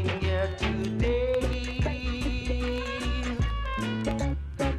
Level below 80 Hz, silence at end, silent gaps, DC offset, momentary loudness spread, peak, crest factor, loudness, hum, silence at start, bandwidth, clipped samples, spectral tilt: -32 dBFS; 0 s; none; under 0.1%; 4 LU; -14 dBFS; 14 dB; -29 LUFS; none; 0 s; 12 kHz; under 0.1%; -6 dB/octave